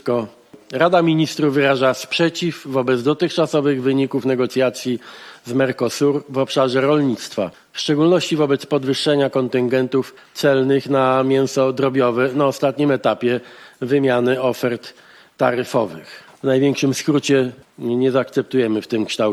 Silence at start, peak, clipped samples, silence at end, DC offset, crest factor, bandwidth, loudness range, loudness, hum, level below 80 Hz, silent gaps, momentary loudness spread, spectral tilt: 0.05 s; -2 dBFS; under 0.1%; 0 s; under 0.1%; 16 dB; 14 kHz; 2 LU; -18 LUFS; none; -66 dBFS; none; 9 LU; -5.5 dB/octave